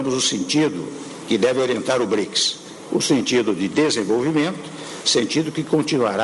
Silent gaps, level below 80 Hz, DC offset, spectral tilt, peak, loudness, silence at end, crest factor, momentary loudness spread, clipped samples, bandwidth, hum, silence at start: none; -62 dBFS; under 0.1%; -3.5 dB/octave; -6 dBFS; -20 LUFS; 0 s; 14 dB; 8 LU; under 0.1%; 11.5 kHz; none; 0 s